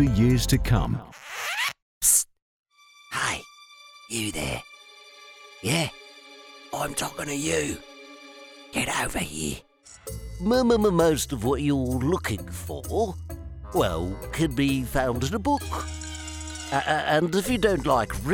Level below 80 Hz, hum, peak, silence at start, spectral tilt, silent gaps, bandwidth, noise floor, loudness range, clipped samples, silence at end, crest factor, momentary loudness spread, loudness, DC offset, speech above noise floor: -40 dBFS; none; -6 dBFS; 0 s; -4.5 dB/octave; 1.82-2.01 s, 2.42-2.66 s; 19.5 kHz; -50 dBFS; 6 LU; under 0.1%; 0 s; 20 dB; 23 LU; -26 LUFS; under 0.1%; 25 dB